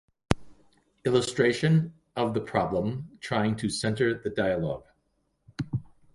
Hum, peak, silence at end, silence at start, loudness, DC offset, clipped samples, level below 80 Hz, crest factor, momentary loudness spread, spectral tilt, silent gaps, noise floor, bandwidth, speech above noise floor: none; -2 dBFS; 0.3 s; 0.3 s; -28 LUFS; under 0.1%; under 0.1%; -50 dBFS; 26 dB; 11 LU; -6 dB/octave; none; -73 dBFS; 11.5 kHz; 47 dB